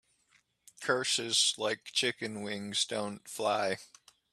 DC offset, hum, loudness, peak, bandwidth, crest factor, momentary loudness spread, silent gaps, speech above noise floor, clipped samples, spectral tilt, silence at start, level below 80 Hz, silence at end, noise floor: under 0.1%; none; -31 LUFS; -12 dBFS; 14.5 kHz; 22 dB; 12 LU; none; 38 dB; under 0.1%; -1.5 dB/octave; 0.8 s; -80 dBFS; 0.45 s; -71 dBFS